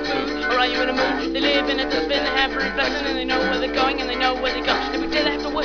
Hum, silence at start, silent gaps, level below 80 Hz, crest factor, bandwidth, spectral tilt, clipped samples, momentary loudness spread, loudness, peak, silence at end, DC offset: none; 0 s; none; -40 dBFS; 16 dB; 5.4 kHz; -3.5 dB/octave; under 0.1%; 3 LU; -20 LUFS; -4 dBFS; 0 s; 0.4%